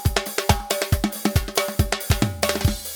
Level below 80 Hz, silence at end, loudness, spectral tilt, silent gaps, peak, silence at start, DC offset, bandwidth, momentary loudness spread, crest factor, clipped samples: -30 dBFS; 0 s; -22 LUFS; -4 dB/octave; none; -2 dBFS; 0 s; under 0.1%; 19.5 kHz; 2 LU; 22 dB; under 0.1%